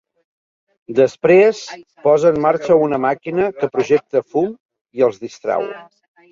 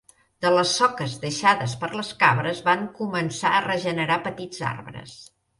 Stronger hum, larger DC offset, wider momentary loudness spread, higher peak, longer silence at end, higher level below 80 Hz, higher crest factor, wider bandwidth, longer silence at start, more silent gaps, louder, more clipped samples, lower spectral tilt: neither; neither; first, 15 LU vs 11 LU; about the same, -2 dBFS vs -4 dBFS; first, 0.5 s vs 0.35 s; about the same, -60 dBFS vs -62 dBFS; about the same, 16 dB vs 20 dB; second, 7.6 kHz vs 11.5 kHz; first, 0.9 s vs 0.4 s; first, 4.60-4.69 s, 4.81-4.85 s vs none; first, -16 LUFS vs -23 LUFS; neither; first, -6.5 dB/octave vs -4 dB/octave